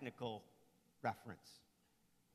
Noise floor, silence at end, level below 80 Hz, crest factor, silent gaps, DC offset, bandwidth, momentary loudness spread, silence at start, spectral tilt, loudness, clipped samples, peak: -77 dBFS; 0.75 s; -84 dBFS; 24 dB; none; under 0.1%; 14 kHz; 17 LU; 0 s; -5.5 dB/octave; -49 LUFS; under 0.1%; -26 dBFS